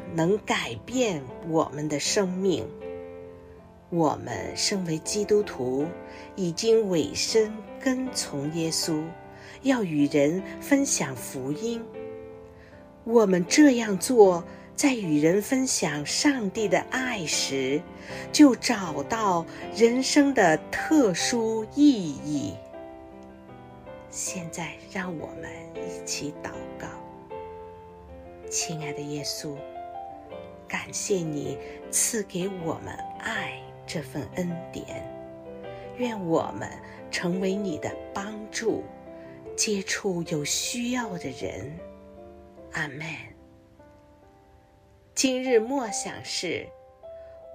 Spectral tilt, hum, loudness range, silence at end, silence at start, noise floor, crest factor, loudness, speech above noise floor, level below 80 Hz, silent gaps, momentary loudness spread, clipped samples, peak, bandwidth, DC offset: -4 dB/octave; none; 12 LU; 0 s; 0 s; -56 dBFS; 22 dB; -26 LUFS; 31 dB; -58 dBFS; none; 21 LU; under 0.1%; -4 dBFS; 15.5 kHz; under 0.1%